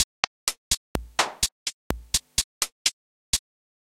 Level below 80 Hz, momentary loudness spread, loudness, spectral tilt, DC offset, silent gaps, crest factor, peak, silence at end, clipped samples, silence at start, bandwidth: -44 dBFS; 6 LU; -27 LUFS; -0.5 dB/octave; under 0.1%; 0.04-0.47 s, 0.57-0.71 s, 0.77-0.95 s, 1.52-1.66 s, 1.74-1.90 s, 2.44-2.61 s, 2.72-2.85 s, 2.93-3.33 s; 28 dB; 0 dBFS; 0.4 s; under 0.1%; 0 s; 16.5 kHz